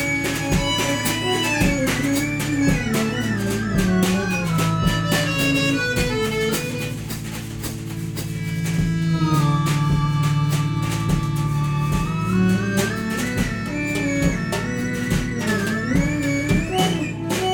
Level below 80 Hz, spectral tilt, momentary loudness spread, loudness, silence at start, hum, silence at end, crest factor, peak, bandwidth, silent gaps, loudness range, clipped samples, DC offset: -36 dBFS; -5 dB/octave; 6 LU; -21 LUFS; 0 s; none; 0 s; 14 dB; -6 dBFS; over 20 kHz; none; 3 LU; under 0.1%; under 0.1%